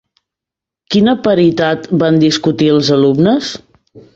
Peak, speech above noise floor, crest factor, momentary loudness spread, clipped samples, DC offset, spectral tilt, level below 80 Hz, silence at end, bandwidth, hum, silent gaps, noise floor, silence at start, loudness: -2 dBFS; 74 dB; 12 dB; 6 LU; under 0.1%; under 0.1%; -6 dB/octave; -50 dBFS; 0.15 s; 8 kHz; none; none; -85 dBFS; 0.9 s; -12 LUFS